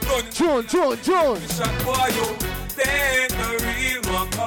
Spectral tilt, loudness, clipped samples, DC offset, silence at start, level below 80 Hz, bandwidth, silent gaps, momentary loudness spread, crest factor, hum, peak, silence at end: -3.5 dB/octave; -21 LUFS; under 0.1%; under 0.1%; 0 s; -36 dBFS; over 20 kHz; none; 5 LU; 12 dB; none; -10 dBFS; 0 s